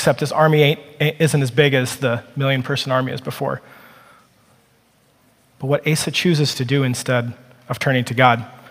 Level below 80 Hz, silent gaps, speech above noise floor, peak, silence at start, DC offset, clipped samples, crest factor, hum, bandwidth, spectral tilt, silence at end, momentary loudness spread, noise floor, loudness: -60 dBFS; none; 39 dB; 0 dBFS; 0 s; under 0.1%; under 0.1%; 20 dB; none; 16 kHz; -5 dB/octave; 0.15 s; 10 LU; -57 dBFS; -18 LUFS